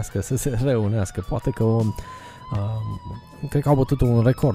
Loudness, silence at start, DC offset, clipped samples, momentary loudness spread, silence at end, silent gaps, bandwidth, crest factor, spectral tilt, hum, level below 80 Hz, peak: -23 LUFS; 0 s; under 0.1%; under 0.1%; 16 LU; 0 s; none; 16 kHz; 18 dB; -7.5 dB/octave; none; -38 dBFS; -4 dBFS